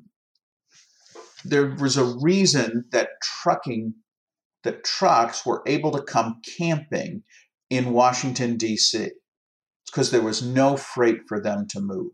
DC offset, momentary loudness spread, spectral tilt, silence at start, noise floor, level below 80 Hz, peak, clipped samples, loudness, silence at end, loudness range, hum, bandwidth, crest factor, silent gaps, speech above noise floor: under 0.1%; 11 LU; -4 dB/octave; 1.15 s; -57 dBFS; -72 dBFS; -6 dBFS; under 0.1%; -23 LUFS; 0.05 s; 2 LU; none; 12 kHz; 18 dB; 4.17-4.27 s, 4.45-4.50 s, 9.28-9.62 s, 9.76-9.80 s; 35 dB